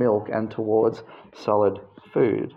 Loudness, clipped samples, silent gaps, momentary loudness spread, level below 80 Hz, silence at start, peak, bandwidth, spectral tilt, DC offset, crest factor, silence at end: -24 LUFS; under 0.1%; none; 10 LU; -66 dBFS; 0 s; -8 dBFS; 6.8 kHz; -8.5 dB/octave; under 0.1%; 16 dB; 0.05 s